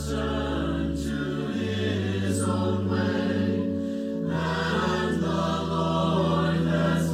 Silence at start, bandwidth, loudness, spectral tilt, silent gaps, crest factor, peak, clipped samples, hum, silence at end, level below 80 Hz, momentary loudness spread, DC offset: 0 s; 14 kHz; -26 LUFS; -6.5 dB/octave; none; 12 dB; -12 dBFS; under 0.1%; none; 0 s; -42 dBFS; 5 LU; under 0.1%